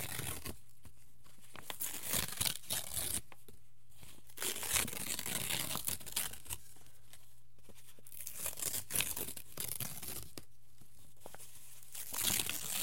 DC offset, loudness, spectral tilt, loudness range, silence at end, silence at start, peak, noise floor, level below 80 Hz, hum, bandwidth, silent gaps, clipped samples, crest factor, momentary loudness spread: 0.6%; -38 LUFS; -1 dB/octave; 4 LU; 0 s; 0 s; -12 dBFS; -66 dBFS; -64 dBFS; none; 17 kHz; none; under 0.1%; 32 dB; 22 LU